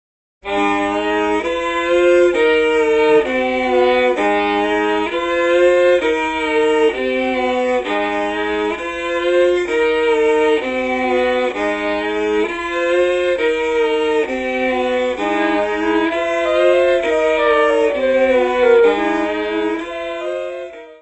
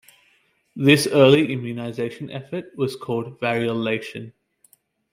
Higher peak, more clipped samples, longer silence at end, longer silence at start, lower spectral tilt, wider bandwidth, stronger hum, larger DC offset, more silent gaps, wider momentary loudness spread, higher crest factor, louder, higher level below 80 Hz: about the same, -2 dBFS vs -2 dBFS; neither; second, 0.05 s vs 0.85 s; second, 0.45 s vs 0.75 s; second, -4 dB/octave vs -5.5 dB/octave; second, 8.4 kHz vs 16 kHz; neither; neither; neither; second, 6 LU vs 18 LU; second, 14 dB vs 20 dB; first, -16 LUFS vs -21 LUFS; first, -46 dBFS vs -62 dBFS